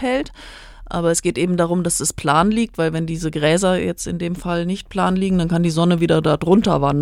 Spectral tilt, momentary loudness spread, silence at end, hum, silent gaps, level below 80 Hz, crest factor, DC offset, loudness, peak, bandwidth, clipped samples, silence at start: -5.5 dB/octave; 8 LU; 0 s; none; none; -40 dBFS; 18 dB; under 0.1%; -18 LUFS; -2 dBFS; 15.5 kHz; under 0.1%; 0 s